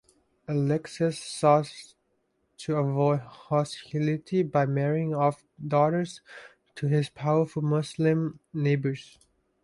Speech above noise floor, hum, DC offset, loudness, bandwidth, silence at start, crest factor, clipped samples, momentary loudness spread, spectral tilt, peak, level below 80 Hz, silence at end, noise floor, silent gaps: 47 dB; none; under 0.1%; -27 LUFS; 11.5 kHz; 0.5 s; 20 dB; under 0.1%; 15 LU; -7 dB/octave; -8 dBFS; -66 dBFS; 0.6 s; -73 dBFS; none